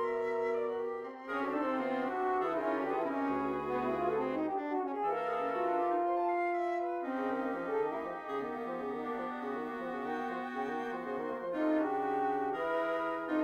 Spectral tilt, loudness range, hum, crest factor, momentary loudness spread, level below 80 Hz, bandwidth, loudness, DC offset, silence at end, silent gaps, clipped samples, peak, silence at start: -6.5 dB/octave; 4 LU; none; 14 dB; 6 LU; -70 dBFS; 14.5 kHz; -35 LUFS; under 0.1%; 0 s; none; under 0.1%; -22 dBFS; 0 s